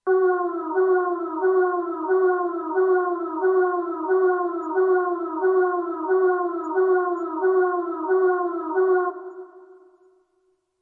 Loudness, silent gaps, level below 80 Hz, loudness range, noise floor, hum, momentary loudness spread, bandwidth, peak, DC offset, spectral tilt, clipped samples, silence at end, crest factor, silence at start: -22 LUFS; none; under -90 dBFS; 2 LU; -68 dBFS; none; 5 LU; 2 kHz; -12 dBFS; under 0.1%; -7 dB/octave; under 0.1%; 1.15 s; 12 dB; 0.05 s